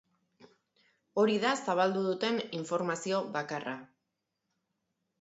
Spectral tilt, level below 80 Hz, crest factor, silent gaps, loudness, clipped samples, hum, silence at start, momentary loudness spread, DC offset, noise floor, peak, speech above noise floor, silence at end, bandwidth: -4.5 dB/octave; -82 dBFS; 20 dB; none; -32 LUFS; under 0.1%; none; 0.4 s; 10 LU; under 0.1%; -84 dBFS; -14 dBFS; 53 dB; 1.35 s; 8.2 kHz